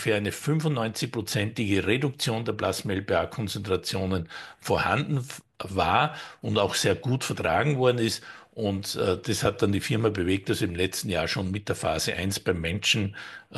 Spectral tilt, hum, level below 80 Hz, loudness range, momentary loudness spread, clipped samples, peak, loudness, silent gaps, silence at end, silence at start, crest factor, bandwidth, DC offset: -4.5 dB/octave; none; -52 dBFS; 2 LU; 8 LU; under 0.1%; -8 dBFS; -27 LUFS; none; 0 s; 0 s; 20 dB; 12.5 kHz; under 0.1%